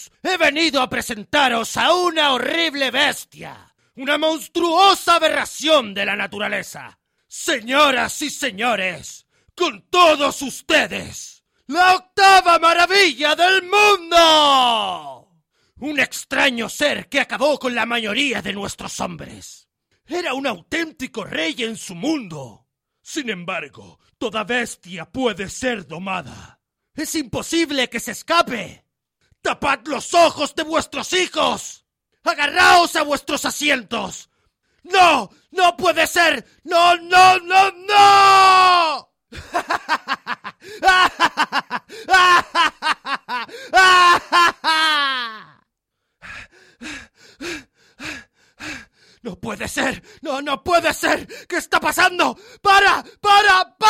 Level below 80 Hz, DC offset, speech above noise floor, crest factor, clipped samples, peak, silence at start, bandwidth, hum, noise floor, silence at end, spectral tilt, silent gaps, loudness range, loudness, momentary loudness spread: -52 dBFS; under 0.1%; 58 dB; 16 dB; under 0.1%; -2 dBFS; 0 s; 16.5 kHz; none; -76 dBFS; 0 s; -2 dB/octave; none; 12 LU; -17 LUFS; 19 LU